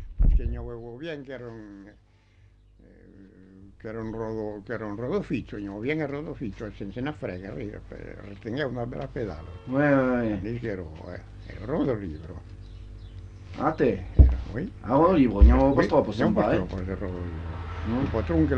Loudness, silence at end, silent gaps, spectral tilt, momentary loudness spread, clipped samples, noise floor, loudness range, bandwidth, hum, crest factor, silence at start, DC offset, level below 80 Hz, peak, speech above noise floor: -27 LUFS; 0 s; none; -9 dB/octave; 21 LU; under 0.1%; -57 dBFS; 16 LU; 6.4 kHz; 50 Hz at -45 dBFS; 22 dB; 0 s; under 0.1%; -30 dBFS; -4 dBFS; 31 dB